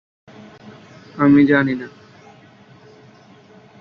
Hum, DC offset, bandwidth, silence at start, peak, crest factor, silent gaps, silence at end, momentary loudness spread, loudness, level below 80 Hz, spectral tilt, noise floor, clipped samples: none; under 0.1%; 5.8 kHz; 0.65 s; -2 dBFS; 18 dB; none; 1.95 s; 24 LU; -15 LUFS; -60 dBFS; -8.5 dB/octave; -47 dBFS; under 0.1%